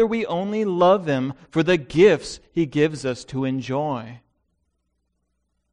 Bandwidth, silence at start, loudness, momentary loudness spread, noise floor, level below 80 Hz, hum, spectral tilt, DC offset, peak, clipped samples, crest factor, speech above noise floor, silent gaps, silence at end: 10.5 kHz; 0 s; -21 LUFS; 11 LU; -73 dBFS; -54 dBFS; none; -6.5 dB/octave; under 0.1%; -4 dBFS; under 0.1%; 18 dB; 52 dB; none; 1.55 s